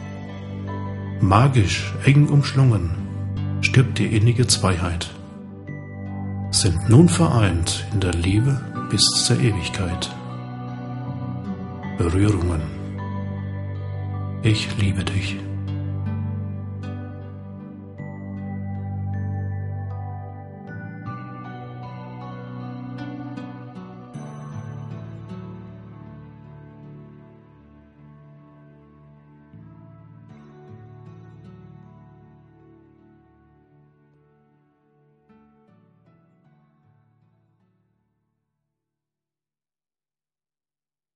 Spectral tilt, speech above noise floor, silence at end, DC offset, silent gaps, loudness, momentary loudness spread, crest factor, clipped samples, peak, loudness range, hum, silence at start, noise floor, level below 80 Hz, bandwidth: -5 dB/octave; over 72 dB; 9.1 s; under 0.1%; none; -22 LUFS; 21 LU; 24 dB; under 0.1%; 0 dBFS; 18 LU; none; 0 s; under -90 dBFS; -44 dBFS; 11.5 kHz